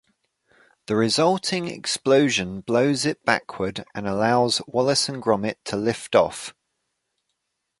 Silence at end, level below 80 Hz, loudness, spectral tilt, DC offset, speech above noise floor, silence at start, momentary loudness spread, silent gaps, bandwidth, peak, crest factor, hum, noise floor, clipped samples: 1.3 s; -58 dBFS; -22 LUFS; -4 dB/octave; under 0.1%; 56 dB; 0.9 s; 9 LU; none; 11.5 kHz; -2 dBFS; 22 dB; none; -78 dBFS; under 0.1%